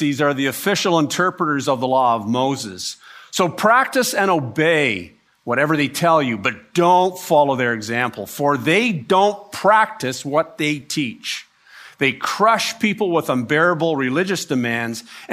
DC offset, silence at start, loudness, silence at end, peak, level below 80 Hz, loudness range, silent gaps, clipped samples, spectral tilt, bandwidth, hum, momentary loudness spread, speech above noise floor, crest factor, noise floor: under 0.1%; 0 s; -18 LUFS; 0 s; -2 dBFS; -66 dBFS; 2 LU; none; under 0.1%; -4.5 dB/octave; 15.5 kHz; none; 9 LU; 26 dB; 16 dB; -45 dBFS